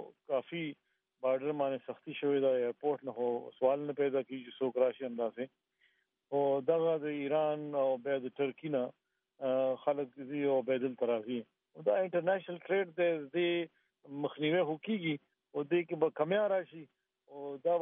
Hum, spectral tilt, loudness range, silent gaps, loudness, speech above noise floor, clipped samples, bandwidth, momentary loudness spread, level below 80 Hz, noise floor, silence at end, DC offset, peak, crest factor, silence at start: none; -4.5 dB/octave; 1 LU; none; -34 LUFS; 41 dB; under 0.1%; 3.8 kHz; 10 LU; under -90 dBFS; -75 dBFS; 0 s; under 0.1%; -16 dBFS; 18 dB; 0 s